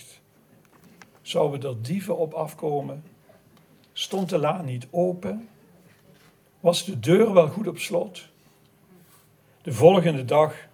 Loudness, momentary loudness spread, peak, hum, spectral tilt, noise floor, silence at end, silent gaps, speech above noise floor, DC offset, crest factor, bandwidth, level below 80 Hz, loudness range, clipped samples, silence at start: -23 LUFS; 19 LU; -2 dBFS; none; -6 dB/octave; -58 dBFS; 0.1 s; none; 36 dB; under 0.1%; 24 dB; 18 kHz; -66 dBFS; 6 LU; under 0.1%; 1.25 s